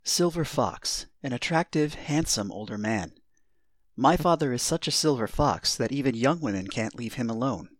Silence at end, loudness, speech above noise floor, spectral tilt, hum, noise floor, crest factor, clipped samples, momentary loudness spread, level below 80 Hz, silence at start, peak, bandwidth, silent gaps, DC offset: 0.15 s; -27 LUFS; 47 dB; -4 dB/octave; none; -74 dBFS; 20 dB; under 0.1%; 8 LU; -48 dBFS; 0.05 s; -6 dBFS; 18 kHz; none; 0.1%